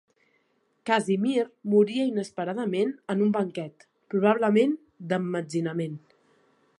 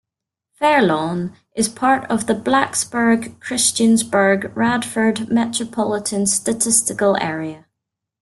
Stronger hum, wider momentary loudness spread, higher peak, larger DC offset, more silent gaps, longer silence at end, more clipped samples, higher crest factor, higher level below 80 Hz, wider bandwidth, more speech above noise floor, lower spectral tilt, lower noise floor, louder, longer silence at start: neither; first, 12 LU vs 7 LU; second, -8 dBFS vs -2 dBFS; neither; neither; first, 0.8 s vs 0.65 s; neither; about the same, 20 dB vs 18 dB; second, -78 dBFS vs -58 dBFS; second, 11 kHz vs 12.5 kHz; second, 45 dB vs 66 dB; first, -6.5 dB/octave vs -3.5 dB/octave; second, -70 dBFS vs -84 dBFS; second, -26 LUFS vs -18 LUFS; first, 0.85 s vs 0.6 s